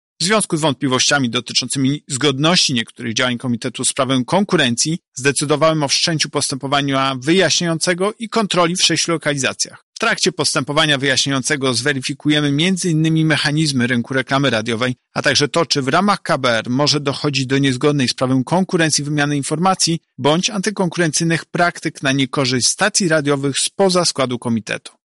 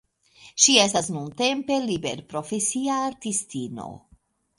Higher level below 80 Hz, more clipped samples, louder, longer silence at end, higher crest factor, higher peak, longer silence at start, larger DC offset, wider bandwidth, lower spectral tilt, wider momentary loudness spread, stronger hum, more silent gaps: first, -56 dBFS vs -62 dBFS; neither; first, -16 LUFS vs -23 LUFS; second, 0.25 s vs 0.6 s; second, 16 dB vs 24 dB; about the same, -2 dBFS vs -2 dBFS; second, 0.2 s vs 0.4 s; neither; about the same, 11.5 kHz vs 11.5 kHz; first, -3.5 dB/octave vs -2 dB/octave; second, 5 LU vs 18 LU; neither; first, 5.08-5.12 s, 9.83-9.93 s vs none